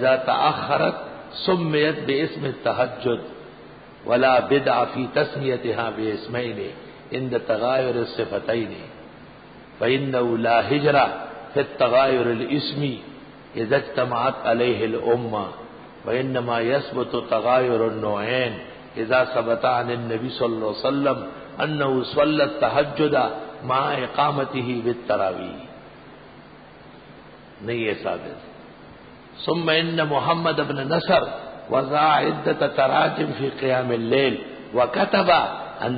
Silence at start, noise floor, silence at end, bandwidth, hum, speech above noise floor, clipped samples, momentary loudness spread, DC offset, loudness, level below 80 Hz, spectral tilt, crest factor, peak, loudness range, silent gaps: 0 s; -45 dBFS; 0 s; 5 kHz; none; 23 dB; under 0.1%; 14 LU; under 0.1%; -22 LUFS; -56 dBFS; -10.5 dB/octave; 18 dB; -6 dBFS; 5 LU; none